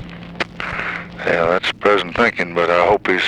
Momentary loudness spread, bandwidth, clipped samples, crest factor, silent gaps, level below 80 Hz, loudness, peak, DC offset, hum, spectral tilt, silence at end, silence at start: 10 LU; 11 kHz; under 0.1%; 18 dB; none; -44 dBFS; -17 LUFS; 0 dBFS; under 0.1%; none; -5 dB/octave; 0 s; 0 s